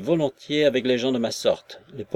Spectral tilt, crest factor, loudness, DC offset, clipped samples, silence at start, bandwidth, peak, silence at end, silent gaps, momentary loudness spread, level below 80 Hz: -5 dB/octave; 16 dB; -23 LUFS; under 0.1%; under 0.1%; 0 s; 15 kHz; -6 dBFS; 0 s; none; 12 LU; -64 dBFS